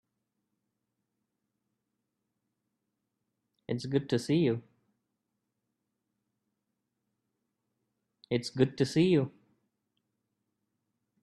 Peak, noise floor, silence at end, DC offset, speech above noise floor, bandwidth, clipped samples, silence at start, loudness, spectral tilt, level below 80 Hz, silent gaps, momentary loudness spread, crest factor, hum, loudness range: -12 dBFS; -84 dBFS; 1.95 s; under 0.1%; 56 dB; 12.5 kHz; under 0.1%; 3.7 s; -30 LUFS; -6.5 dB/octave; -72 dBFS; none; 12 LU; 24 dB; none; 8 LU